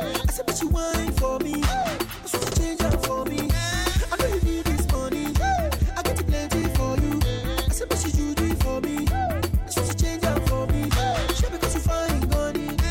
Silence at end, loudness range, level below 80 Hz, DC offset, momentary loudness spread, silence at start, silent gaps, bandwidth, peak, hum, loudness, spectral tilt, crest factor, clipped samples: 0 s; 1 LU; -28 dBFS; under 0.1%; 2 LU; 0 s; none; 17 kHz; -8 dBFS; none; -25 LUFS; -5 dB/octave; 14 dB; under 0.1%